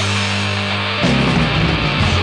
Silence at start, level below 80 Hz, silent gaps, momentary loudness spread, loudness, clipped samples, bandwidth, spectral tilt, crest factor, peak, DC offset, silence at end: 0 s; -30 dBFS; none; 3 LU; -16 LUFS; under 0.1%; 10 kHz; -5 dB/octave; 14 dB; -2 dBFS; under 0.1%; 0 s